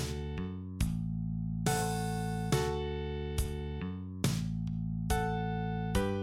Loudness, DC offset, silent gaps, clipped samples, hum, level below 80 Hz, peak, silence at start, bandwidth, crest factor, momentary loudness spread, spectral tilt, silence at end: -35 LUFS; under 0.1%; none; under 0.1%; none; -42 dBFS; -16 dBFS; 0 s; 16 kHz; 18 dB; 7 LU; -5.5 dB/octave; 0 s